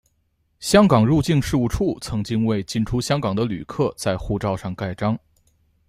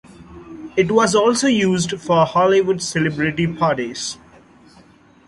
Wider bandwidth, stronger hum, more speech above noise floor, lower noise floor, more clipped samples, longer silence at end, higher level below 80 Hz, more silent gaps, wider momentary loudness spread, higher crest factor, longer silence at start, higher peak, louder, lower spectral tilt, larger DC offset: first, 15.5 kHz vs 11.5 kHz; neither; first, 47 dB vs 32 dB; first, -67 dBFS vs -49 dBFS; neither; second, 0.7 s vs 1.15 s; first, -40 dBFS vs -52 dBFS; neither; about the same, 10 LU vs 12 LU; about the same, 20 dB vs 16 dB; first, 0.6 s vs 0.2 s; about the same, -2 dBFS vs -2 dBFS; second, -21 LUFS vs -18 LUFS; first, -6 dB/octave vs -4.5 dB/octave; neither